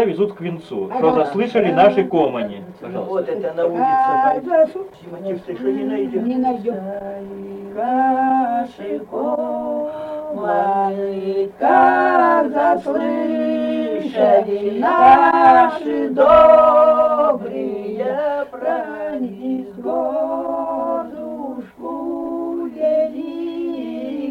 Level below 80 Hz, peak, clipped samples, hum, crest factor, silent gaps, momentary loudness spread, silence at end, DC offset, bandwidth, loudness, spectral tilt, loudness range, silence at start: -54 dBFS; -2 dBFS; under 0.1%; none; 16 dB; none; 16 LU; 0 s; under 0.1%; 6.4 kHz; -17 LUFS; -7.5 dB/octave; 11 LU; 0 s